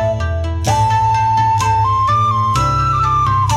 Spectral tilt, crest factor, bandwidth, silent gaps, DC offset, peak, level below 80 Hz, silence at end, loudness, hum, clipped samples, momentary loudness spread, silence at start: -5 dB/octave; 10 dB; 13.5 kHz; none; under 0.1%; -4 dBFS; -30 dBFS; 0 s; -14 LUFS; none; under 0.1%; 4 LU; 0 s